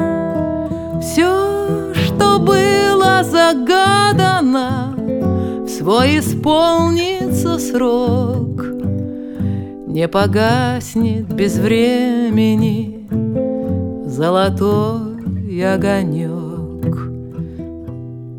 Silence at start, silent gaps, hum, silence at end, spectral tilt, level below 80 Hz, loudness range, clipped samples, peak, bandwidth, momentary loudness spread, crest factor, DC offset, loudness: 0 s; none; none; 0 s; -6 dB/octave; -42 dBFS; 5 LU; under 0.1%; 0 dBFS; 19 kHz; 11 LU; 14 dB; under 0.1%; -16 LUFS